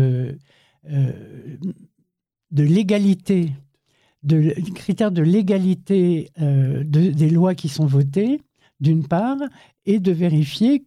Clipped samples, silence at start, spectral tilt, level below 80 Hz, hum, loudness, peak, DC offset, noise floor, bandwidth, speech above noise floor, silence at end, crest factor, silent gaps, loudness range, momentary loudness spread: under 0.1%; 0 s; -8.5 dB/octave; -60 dBFS; none; -19 LUFS; -6 dBFS; under 0.1%; -72 dBFS; 12 kHz; 54 dB; 0.05 s; 12 dB; none; 4 LU; 14 LU